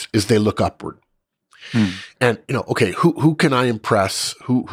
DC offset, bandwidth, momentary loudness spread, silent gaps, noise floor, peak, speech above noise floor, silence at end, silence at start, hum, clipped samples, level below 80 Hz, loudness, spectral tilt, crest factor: under 0.1%; 16 kHz; 7 LU; none; -59 dBFS; -2 dBFS; 40 dB; 0 s; 0 s; none; under 0.1%; -52 dBFS; -19 LUFS; -5.5 dB/octave; 16 dB